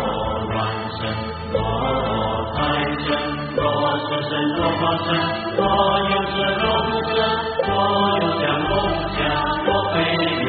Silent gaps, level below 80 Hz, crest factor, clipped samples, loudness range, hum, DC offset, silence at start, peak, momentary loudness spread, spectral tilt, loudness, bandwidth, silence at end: none; -38 dBFS; 16 dB; under 0.1%; 3 LU; none; under 0.1%; 0 s; -4 dBFS; 5 LU; -3 dB/octave; -20 LUFS; 4.9 kHz; 0 s